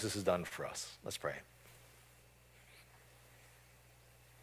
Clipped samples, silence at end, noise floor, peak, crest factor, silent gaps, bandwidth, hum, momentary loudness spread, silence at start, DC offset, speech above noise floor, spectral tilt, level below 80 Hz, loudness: under 0.1%; 0 s; -64 dBFS; -18 dBFS; 26 dB; none; 16 kHz; none; 26 LU; 0 s; under 0.1%; 24 dB; -3.5 dB/octave; -68 dBFS; -41 LUFS